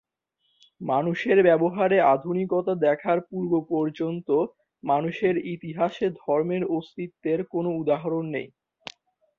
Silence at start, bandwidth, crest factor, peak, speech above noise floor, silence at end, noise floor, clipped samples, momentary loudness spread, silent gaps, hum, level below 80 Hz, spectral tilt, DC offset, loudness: 0.8 s; 7 kHz; 18 dB; -6 dBFS; 50 dB; 0.9 s; -74 dBFS; under 0.1%; 14 LU; none; none; -68 dBFS; -8.5 dB/octave; under 0.1%; -25 LUFS